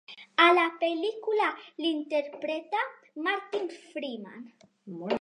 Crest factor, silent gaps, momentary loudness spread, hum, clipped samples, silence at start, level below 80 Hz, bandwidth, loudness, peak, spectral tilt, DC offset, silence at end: 22 dB; none; 18 LU; none; under 0.1%; 0.1 s; -86 dBFS; 10.5 kHz; -28 LUFS; -8 dBFS; -4.5 dB/octave; under 0.1%; 0 s